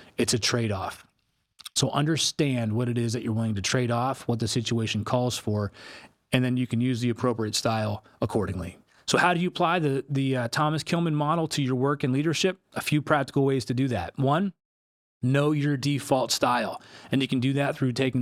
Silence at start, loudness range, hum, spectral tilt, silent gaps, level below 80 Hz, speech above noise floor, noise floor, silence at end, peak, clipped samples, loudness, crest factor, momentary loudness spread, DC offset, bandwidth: 0 s; 2 LU; none; -5 dB/octave; 14.65-15.20 s; -62 dBFS; 48 dB; -73 dBFS; 0 s; -6 dBFS; under 0.1%; -26 LUFS; 20 dB; 7 LU; under 0.1%; 15.5 kHz